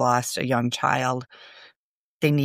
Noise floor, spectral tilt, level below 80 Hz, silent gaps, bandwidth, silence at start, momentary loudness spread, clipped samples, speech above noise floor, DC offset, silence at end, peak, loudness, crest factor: -79 dBFS; -5 dB/octave; -68 dBFS; 1.76-2.19 s; 15.5 kHz; 0 s; 15 LU; under 0.1%; 55 dB; under 0.1%; 0 s; -6 dBFS; -24 LUFS; 18 dB